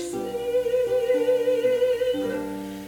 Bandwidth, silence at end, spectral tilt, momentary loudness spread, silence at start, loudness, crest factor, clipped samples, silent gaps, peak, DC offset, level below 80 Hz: 18.5 kHz; 0 s; -5 dB/octave; 8 LU; 0 s; -24 LUFS; 12 dB; under 0.1%; none; -12 dBFS; under 0.1%; -56 dBFS